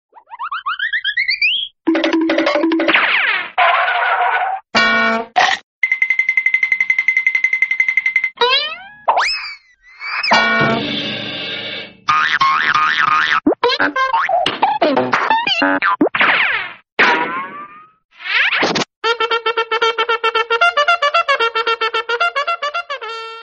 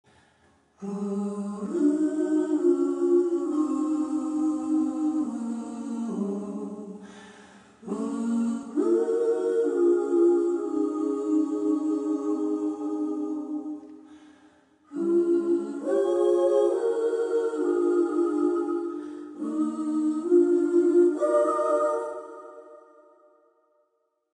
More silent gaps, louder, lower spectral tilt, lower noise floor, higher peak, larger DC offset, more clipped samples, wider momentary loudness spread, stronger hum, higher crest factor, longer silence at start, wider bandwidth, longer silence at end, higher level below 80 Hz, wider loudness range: first, 5.63-5.82 s, 16.92-16.97 s, 18.05-18.09 s, 18.96-19.02 s vs none; first, -15 LUFS vs -26 LUFS; second, -3 dB/octave vs -7.5 dB/octave; second, -40 dBFS vs -74 dBFS; first, 0 dBFS vs -10 dBFS; neither; neither; second, 9 LU vs 13 LU; neither; about the same, 16 dB vs 16 dB; second, 0.3 s vs 0.8 s; second, 8.4 kHz vs 9.8 kHz; second, 0 s vs 1.6 s; first, -58 dBFS vs -78 dBFS; second, 3 LU vs 6 LU